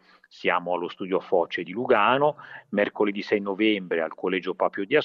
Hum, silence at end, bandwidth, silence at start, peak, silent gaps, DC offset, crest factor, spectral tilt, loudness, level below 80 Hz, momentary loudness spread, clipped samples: none; 0 s; 6.8 kHz; 0.4 s; -8 dBFS; none; under 0.1%; 16 dB; -7 dB/octave; -25 LUFS; -74 dBFS; 8 LU; under 0.1%